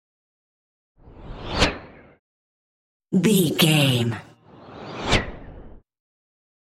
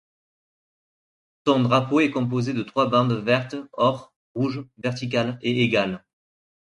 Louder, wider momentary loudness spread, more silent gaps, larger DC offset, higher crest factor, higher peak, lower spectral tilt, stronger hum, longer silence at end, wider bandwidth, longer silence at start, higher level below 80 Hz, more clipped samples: about the same, -21 LUFS vs -23 LUFS; first, 21 LU vs 10 LU; first, 2.19-3.00 s vs 4.16-4.35 s; neither; about the same, 22 dB vs 20 dB; about the same, -4 dBFS vs -4 dBFS; second, -4.5 dB/octave vs -6.5 dB/octave; neither; first, 0.9 s vs 0.7 s; first, 16 kHz vs 10.5 kHz; second, 1.15 s vs 1.45 s; first, -40 dBFS vs -62 dBFS; neither